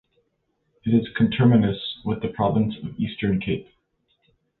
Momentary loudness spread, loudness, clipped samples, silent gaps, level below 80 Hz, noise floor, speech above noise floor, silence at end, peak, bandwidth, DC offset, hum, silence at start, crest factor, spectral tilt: 11 LU; -23 LUFS; under 0.1%; none; -50 dBFS; -72 dBFS; 50 dB; 1 s; -6 dBFS; 4.3 kHz; under 0.1%; none; 0.85 s; 18 dB; -11.5 dB/octave